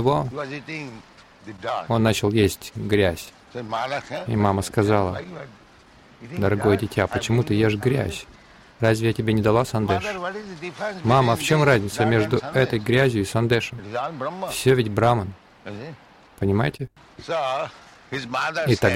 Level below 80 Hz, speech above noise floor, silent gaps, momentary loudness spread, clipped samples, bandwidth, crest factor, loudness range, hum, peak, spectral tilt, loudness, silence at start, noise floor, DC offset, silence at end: -48 dBFS; 28 dB; none; 16 LU; under 0.1%; 16.5 kHz; 18 dB; 4 LU; none; -4 dBFS; -6 dB/octave; -22 LUFS; 0 s; -51 dBFS; under 0.1%; 0 s